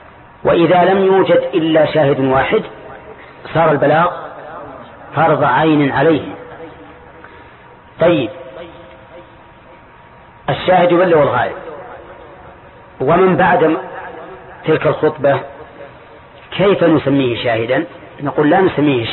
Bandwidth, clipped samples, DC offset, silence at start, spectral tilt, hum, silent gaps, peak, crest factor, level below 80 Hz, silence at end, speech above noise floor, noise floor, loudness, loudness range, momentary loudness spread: 4.3 kHz; under 0.1%; under 0.1%; 0.45 s; -12 dB/octave; none; none; -2 dBFS; 14 dB; -46 dBFS; 0 s; 29 dB; -41 dBFS; -13 LUFS; 7 LU; 22 LU